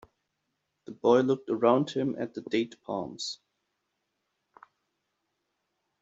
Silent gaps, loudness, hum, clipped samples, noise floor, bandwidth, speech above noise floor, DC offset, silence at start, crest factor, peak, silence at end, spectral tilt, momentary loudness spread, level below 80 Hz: none; -28 LUFS; none; under 0.1%; -81 dBFS; 8 kHz; 54 dB; under 0.1%; 0.9 s; 22 dB; -10 dBFS; 2.65 s; -5 dB/octave; 12 LU; -74 dBFS